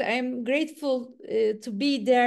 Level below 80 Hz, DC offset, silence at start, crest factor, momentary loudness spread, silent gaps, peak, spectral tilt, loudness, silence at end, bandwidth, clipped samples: -80 dBFS; under 0.1%; 0 s; 14 dB; 4 LU; none; -10 dBFS; -4.5 dB/octave; -27 LUFS; 0 s; 12.5 kHz; under 0.1%